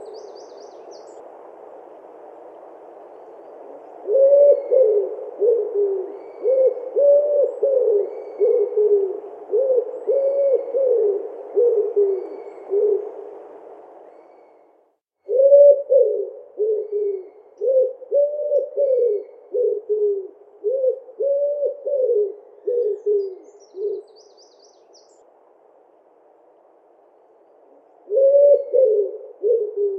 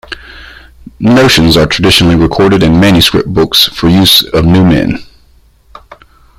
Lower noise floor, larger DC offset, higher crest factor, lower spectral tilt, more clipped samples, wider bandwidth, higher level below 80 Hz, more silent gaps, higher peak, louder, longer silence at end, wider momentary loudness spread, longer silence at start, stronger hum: first, -63 dBFS vs -44 dBFS; neither; first, 18 dB vs 8 dB; about the same, -5.5 dB/octave vs -5 dB/octave; second, under 0.1% vs 0.3%; second, 6 kHz vs over 20 kHz; second, -90 dBFS vs -28 dBFS; neither; about the same, -2 dBFS vs 0 dBFS; second, -19 LUFS vs -7 LUFS; second, 0 s vs 1.35 s; first, 22 LU vs 8 LU; about the same, 0 s vs 0.1 s; neither